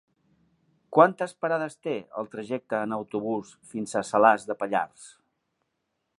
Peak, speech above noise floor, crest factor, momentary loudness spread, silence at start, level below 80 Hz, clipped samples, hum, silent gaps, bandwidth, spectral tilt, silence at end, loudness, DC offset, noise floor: -2 dBFS; 53 dB; 26 dB; 14 LU; 0.9 s; -76 dBFS; under 0.1%; none; none; 11.5 kHz; -5.5 dB/octave; 1.1 s; -26 LUFS; under 0.1%; -79 dBFS